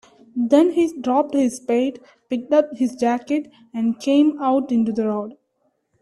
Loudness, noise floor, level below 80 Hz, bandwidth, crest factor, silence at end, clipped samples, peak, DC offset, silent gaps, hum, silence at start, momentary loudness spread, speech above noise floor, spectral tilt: -20 LUFS; -69 dBFS; -66 dBFS; 12 kHz; 18 dB; 0.7 s; under 0.1%; -2 dBFS; under 0.1%; none; none; 0.35 s; 11 LU; 49 dB; -5.5 dB/octave